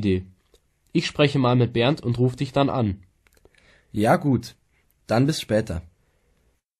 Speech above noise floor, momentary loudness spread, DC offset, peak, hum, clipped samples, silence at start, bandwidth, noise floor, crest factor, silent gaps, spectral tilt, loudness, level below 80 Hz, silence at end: 45 dB; 11 LU; under 0.1%; -4 dBFS; none; under 0.1%; 0 s; 13.5 kHz; -66 dBFS; 18 dB; none; -6.5 dB/octave; -23 LUFS; -50 dBFS; 1 s